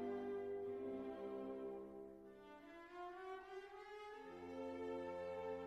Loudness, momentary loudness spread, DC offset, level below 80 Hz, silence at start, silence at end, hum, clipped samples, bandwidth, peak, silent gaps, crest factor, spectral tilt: -51 LUFS; 11 LU; under 0.1%; -80 dBFS; 0 s; 0 s; none; under 0.1%; 12.5 kHz; -36 dBFS; none; 12 dB; -6.5 dB/octave